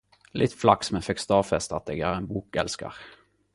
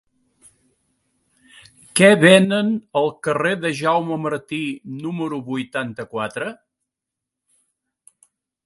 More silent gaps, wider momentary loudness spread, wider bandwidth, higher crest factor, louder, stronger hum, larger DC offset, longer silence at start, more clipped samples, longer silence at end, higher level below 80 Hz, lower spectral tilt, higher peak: neither; about the same, 14 LU vs 16 LU; about the same, 11.5 kHz vs 12 kHz; about the same, 24 dB vs 22 dB; second, -26 LUFS vs -19 LUFS; neither; neither; second, 0.35 s vs 1.95 s; neither; second, 0.45 s vs 2.1 s; first, -50 dBFS vs -66 dBFS; about the same, -5 dB/octave vs -5 dB/octave; about the same, -2 dBFS vs 0 dBFS